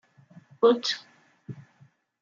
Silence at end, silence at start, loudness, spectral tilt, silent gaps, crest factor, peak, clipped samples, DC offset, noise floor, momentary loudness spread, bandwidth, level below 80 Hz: 0.65 s; 0.6 s; -25 LUFS; -4 dB/octave; none; 22 dB; -8 dBFS; under 0.1%; under 0.1%; -61 dBFS; 23 LU; 7.4 kHz; -80 dBFS